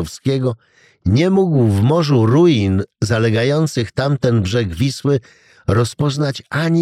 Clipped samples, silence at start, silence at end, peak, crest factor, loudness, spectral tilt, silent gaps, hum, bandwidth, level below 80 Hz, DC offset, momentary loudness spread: under 0.1%; 0 s; 0 s; -2 dBFS; 14 dB; -16 LUFS; -7 dB/octave; none; none; 14 kHz; -42 dBFS; under 0.1%; 7 LU